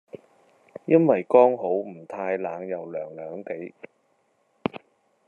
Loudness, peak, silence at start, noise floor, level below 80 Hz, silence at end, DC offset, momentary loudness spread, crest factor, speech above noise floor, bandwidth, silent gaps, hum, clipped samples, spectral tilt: -24 LUFS; -4 dBFS; 0.15 s; -68 dBFS; -78 dBFS; 0.5 s; under 0.1%; 19 LU; 22 dB; 45 dB; 4.2 kHz; none; none; under 0.1%; -9 dB/octave